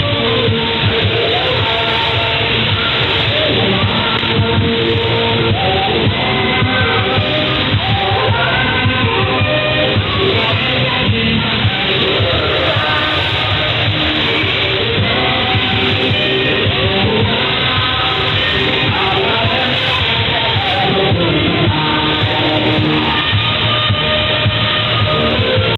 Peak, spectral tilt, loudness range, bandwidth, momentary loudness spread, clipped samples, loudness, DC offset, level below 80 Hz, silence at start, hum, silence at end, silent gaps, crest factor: -4 dBFS; -7 dB/octave; 0 LU; 7 kHz; 1 LU; under 0.1%; -13 LUFS; under 0.1%; -34 dBFS; 0 s; none; 0 s; none; 10 dB